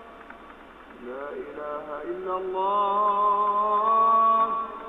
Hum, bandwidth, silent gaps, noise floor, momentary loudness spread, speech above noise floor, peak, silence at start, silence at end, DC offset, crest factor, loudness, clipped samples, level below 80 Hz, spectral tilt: none; 3.9 kHz; none; -46 dBFS; 19 LU; 21 dB; -12 dBFS; 0 s; 0 s; under 0.1%; 14 dB; -23 LUFS; under 0.1%; -60 dBFS; -6.5 dB/octave